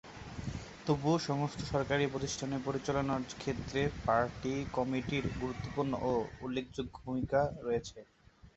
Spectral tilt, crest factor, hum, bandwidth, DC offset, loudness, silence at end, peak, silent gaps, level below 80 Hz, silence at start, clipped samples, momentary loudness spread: -5.5 dB/octave; 18 dB; none; 8 kHz; under 0.1%; -35 LUFS; 0.05 s; -16 dBFS; none; -54 dBFS; 0.05 s; under 0.1%; 10 LU